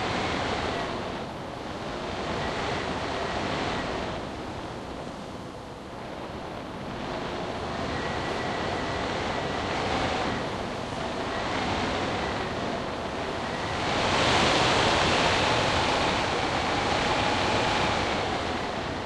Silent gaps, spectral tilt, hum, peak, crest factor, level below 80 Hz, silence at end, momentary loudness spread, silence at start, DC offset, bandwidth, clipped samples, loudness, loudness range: none; -4 dB/octave; none; -10 dBFS; 20 dB; -44 dBFS; 0 s; 14 LU; 0 s; under 0.1%; 12.5 kHz; under 0.1%; -28 LUFS; 11 LU